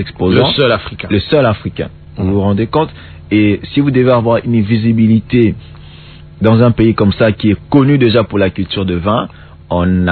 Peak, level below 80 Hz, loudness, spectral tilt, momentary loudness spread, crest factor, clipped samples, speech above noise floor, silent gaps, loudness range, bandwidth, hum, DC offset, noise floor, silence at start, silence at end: 0 dBFS; -38 dBFS; -12 LUFS; -10.5 dB/octave; 8 LU; 12 dB; 0.1%; 23 dB; none; 2 LU; 4.5 kHz; none; under 0.1%; -34 dBFS; 0 s; 0 s